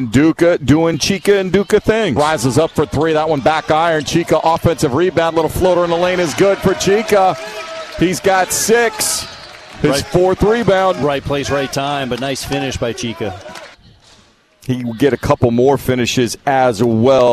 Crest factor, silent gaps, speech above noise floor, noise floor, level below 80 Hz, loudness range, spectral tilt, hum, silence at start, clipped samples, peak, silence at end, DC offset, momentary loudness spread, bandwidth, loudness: 12 dB; none; 35 dB; -49 dBFS; -38 dBFS; 6 LU; -5 dB/octave; none; 0 s; under 0.1%; -2 dBFS; 0 s; under 0.1%; 9 LU; 14 kHz; -14 LUFS